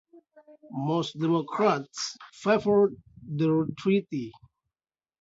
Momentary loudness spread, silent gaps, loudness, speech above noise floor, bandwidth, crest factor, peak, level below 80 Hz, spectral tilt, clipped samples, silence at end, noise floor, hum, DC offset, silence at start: 13 LU; none; -27 LUFS; over 63 dB; 7.8 kHz; 18 dB; -10 dBFS; -66 dBFS; -6 dB/octave; under 0.1%; 0.9 s; under -90 dBFS; none; under 0.1%; 0.65 s